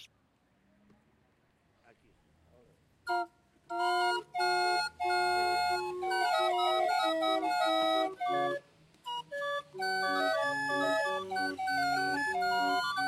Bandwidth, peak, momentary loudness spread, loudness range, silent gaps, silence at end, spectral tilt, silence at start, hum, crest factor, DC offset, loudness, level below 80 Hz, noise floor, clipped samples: 15 kHz; -18 dBFS; 7 LU; 7 LU; none; 0 s; -2.5 dB/octave; 0 s; none; 14 dB; under 0.1%; -31 LUFS; -74 dBFS; -71 dBFS; under 0.1%